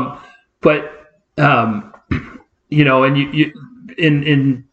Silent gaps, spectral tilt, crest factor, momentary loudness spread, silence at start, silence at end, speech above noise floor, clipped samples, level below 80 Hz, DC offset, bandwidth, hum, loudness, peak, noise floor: none; -8.5 dB/octave; 16 dB; 14 LU; 0 s; 0.1 s; 27 dB; under 0.1%; -44 dBFS; under 0.1%; 6.6 kHz; none; -15 LUFS; 0 dBFS; -41 dBFS